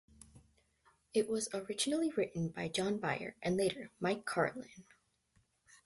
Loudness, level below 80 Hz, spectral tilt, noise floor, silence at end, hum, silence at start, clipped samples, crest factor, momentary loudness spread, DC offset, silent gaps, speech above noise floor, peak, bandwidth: -37 LUFS; -70 dBFS; -4.5 dB/octave; -75 dBFS; 1.05 s; none; 0.35 s; under 0.1%; 18 dB; 5 LU; under 0.1%; none; 39 dB; -20 dBFS; 12 kHz